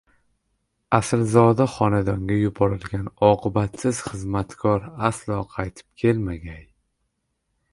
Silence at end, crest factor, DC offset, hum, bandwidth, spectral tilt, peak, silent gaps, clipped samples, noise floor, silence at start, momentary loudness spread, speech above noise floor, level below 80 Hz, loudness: 1.1 s; 22 dB; under 0.1%; none; 11.5 kHz; -7 dB/octave; 0 dBFS; none; under 0.1%; -75 dBFS; 0.9 s; 12 LU; 53 dB; -44 dBFS; -22 LUFS